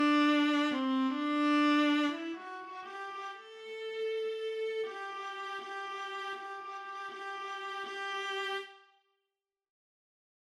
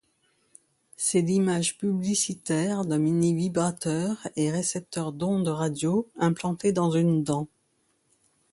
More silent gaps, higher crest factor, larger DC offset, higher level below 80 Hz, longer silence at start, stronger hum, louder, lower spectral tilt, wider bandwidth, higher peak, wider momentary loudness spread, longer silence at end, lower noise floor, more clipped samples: neither; about the same, 16 dB vs 16 dB; neither; second, under -90 dBFS vs -64 dBFS; second, 0 s vs 1 s; neither; second, -34 LUFS vs -26 LUFS; second, -2.5 dB/octave vs -5.5 dB/octave; about the same, 10.5 kHz vs 11.5 kHz; second, -18 dBFS vs -10 dBFS; first, 15 LU vs 6 LU; first, 1.8 s vs 1.05 s; first, -89 dBFS vs -70 dBFS; neither